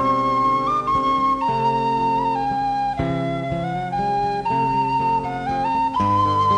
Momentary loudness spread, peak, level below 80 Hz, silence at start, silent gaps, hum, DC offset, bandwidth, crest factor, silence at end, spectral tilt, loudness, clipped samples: 5 LU; -8 dBFS; -44 dBFS; 0 s; none; none; under 0.1%; 10.5 kHz; 12 dB; 0 s; -7 dB/octave; -20 LUFS; under 0.1%